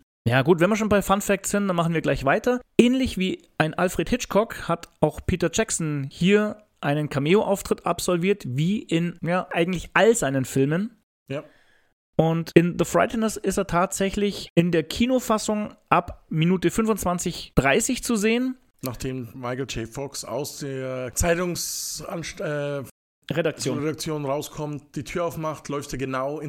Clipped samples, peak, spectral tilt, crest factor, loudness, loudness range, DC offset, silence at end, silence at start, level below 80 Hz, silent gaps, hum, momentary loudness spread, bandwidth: under 0.1%; 0 dBFS; -5 dB/octave; 24 dB; -24 LUFS; 6 LU; under 0.1%; 0 s; 0.25 s; -44 dBFS; 11.03-11.26 s, 11.93-12.13 s, 14.50-14.56 s, 22.91-23.22 s; none; 11 LU; 17 kHz